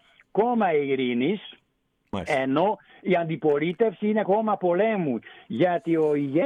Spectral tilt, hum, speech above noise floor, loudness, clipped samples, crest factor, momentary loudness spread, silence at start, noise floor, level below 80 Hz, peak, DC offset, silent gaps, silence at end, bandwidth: -7.5 dB/octave; none; 48 dB; -24 LUFS; under 0.1%; 14 dB; 10 LU; 0.35 s; -72 dBFS; -64 dBFS; -10 dBFS; under 0.1%; none; 0 s; 9.4 kHz